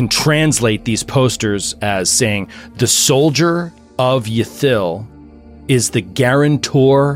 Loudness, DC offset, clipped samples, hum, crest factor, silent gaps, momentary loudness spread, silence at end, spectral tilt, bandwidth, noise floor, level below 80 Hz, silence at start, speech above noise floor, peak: -14 LUFS; under 0.1%; under 0.1%; none; 14 dB; none; 9 LU; 0 s; -4 dB/octave; 16.5 kHz; -38 dBFS; -44 dBFS; 0 s; 24 dB; -2 dBFS